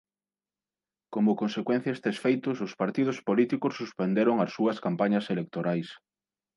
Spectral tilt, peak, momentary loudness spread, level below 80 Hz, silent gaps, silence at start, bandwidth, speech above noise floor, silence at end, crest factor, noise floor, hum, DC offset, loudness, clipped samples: -7.5 dB/octave; -10 dBFS; 7 LU; -76 dBFS; none; 1.1 s; 11.5 kHz; over 63 dB; 0.6 s; 18 dB; under -90 dBFS; none; under 0.1%; -28 LUFS; under 0.1%